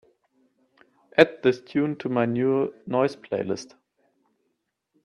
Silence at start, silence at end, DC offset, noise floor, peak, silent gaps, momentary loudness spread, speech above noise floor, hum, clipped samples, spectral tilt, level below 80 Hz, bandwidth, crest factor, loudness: 1.15 s; 1.4 s; under 0.1%; -77 dBFS; 0 dBFS; none; 11 LU; 53 dB; none; under 0.1%; -6.5 dB/octave; -68 dBFS; 10.5 kHz; 26 dB; -24 LUFS